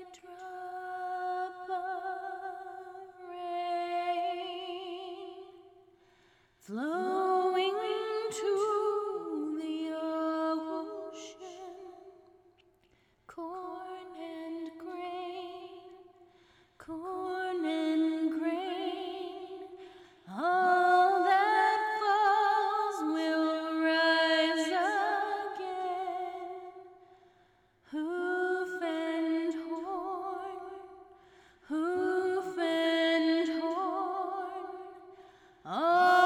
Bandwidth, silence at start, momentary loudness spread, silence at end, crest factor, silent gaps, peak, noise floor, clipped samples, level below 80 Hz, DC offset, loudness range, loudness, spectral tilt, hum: 14 kHz; 0 s; 20 LU; 0 s; 18 dB; none; -14 dBFS; -69 dBFS; under 0.1%; -78 dBFS; under 0.1%; 15 LU; -32 LUFS; -3.5 dB/octave; none